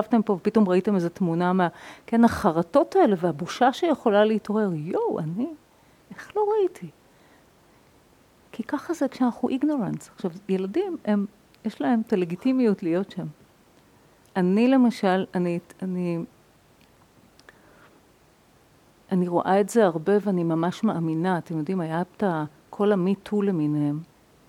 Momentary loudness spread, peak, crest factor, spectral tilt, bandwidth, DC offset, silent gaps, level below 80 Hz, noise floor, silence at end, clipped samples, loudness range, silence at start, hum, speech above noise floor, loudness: 12 LU; -6 dBFS; 20 dB; -7.5 dB/octave; 14.5 kHz; under 0.1%; none; -62 dBFS; -58 dBFS; 0.45 s; under 0.1%; 9 LU; 0 s; none; 35 dB; -24 LUFS